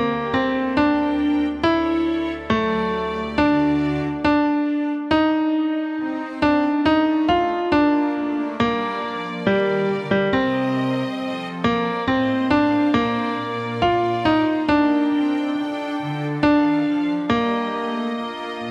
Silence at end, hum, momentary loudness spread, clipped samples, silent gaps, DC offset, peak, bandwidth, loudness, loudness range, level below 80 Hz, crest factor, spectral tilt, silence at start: 0 s; none; 7 LU; under 0.1%; none; under 0.1%; -6 dBFS; 7.4 kHz; -21 LUFS; 2 LU; -46 dBFS; 14 dB; -7 dB/octave; 0 s